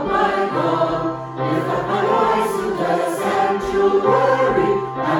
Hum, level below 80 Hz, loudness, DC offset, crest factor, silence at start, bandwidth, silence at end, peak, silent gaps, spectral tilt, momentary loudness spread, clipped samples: none; -46 dBFS; -18 LUFS; under 0.1%; 16 dB; 0 s; 17.5 kHz; 0 s; -2 dBFS; none; -6 dB/octave; 6 LU; under 0.1%